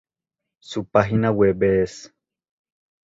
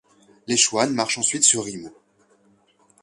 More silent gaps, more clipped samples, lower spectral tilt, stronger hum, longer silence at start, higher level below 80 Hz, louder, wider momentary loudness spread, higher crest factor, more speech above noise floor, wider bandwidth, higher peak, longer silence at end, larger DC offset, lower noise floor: neither; neither; first, -7 dB/octave vs -1.5 dB/octave; neither; first, 0.7 s vs 0.5 s; first, -48 dBFS vs -66 dBFS; about the same, -20 LUFS vs -19 LUFS; about the same, 13 LU vs 12 LU; about the same, 20 dB vs 24 dB; first, 65 dB vs 39 dB; second, 7.8 kHz vs 11.5 kHz; about the same, -2 dBFS vs -2 dBFS; about the same, 1 s vs 1.1 s; neither; first, -85 dBFS vs -60 dBFS